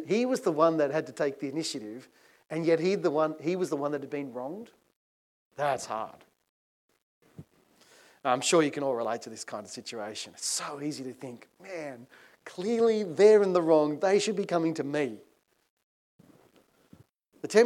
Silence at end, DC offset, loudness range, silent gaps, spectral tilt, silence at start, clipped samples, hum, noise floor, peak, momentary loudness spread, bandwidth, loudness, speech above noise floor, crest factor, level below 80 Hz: 0 s; under 0.1%; 11 LU; 4.96-5.51 s, 6.49-6.89 s, 7.02-7.21 s, 15.70-15.77 s, 15.84-16.19 s; -4.5 dB/octave; 0 s; under 0.1%; none; -64 dBFS; -8 dBFS; 19 LU; 13.5 kHz; -28 LUFS; 35 dB; 22 dB; -84 dBFS